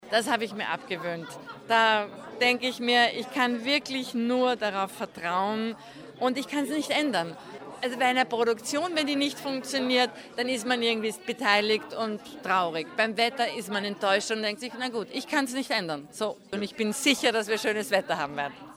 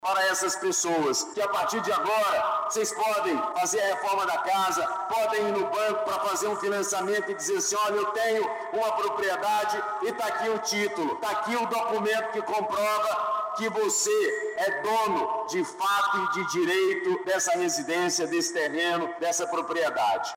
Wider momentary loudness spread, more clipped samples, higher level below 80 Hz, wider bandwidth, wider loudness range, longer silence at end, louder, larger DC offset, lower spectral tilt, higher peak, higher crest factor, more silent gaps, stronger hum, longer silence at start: first, 10 LU vs 4 LU; neither; about the same, -74 dBFS vs -72 dBFS; first, 19.5 kHz vs 16.5 kHz; about the same, 3 LU vs 2 LU; about the same, 0 s vs 0 s; about the same, -27 LUFS vs -26 LUFS; neither; about the same, -3 dB/octave vs -2 dB/octave; first, -6 dBFS vs -16 dBFS; first, 20 dB vs 10 dB; neither; neither; about the same, 0 s vs 0.05 s